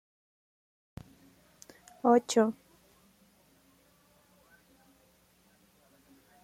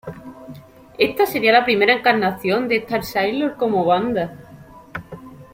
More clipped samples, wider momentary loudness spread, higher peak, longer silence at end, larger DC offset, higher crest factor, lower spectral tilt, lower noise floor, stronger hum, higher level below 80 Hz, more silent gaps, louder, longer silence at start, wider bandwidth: neither; first, 29 LU vs 22 LU; second, -12 dBFS vs -2 dBFS; first, 3.9 s vs 0.1 s; neither; first, 24 dB vs 18 dB; about the same, -4.5 dB/octave vs -5 dB/octave; first, -66 dBFS vs -42 dBFS; neither; second, -70 dBFS vs -54 dBFS; neither; second, -27 LUFS vs -18 LUFS; first, 2.05 s vs 0.05 s; about the same, 16 kHz vs 16.5 kHz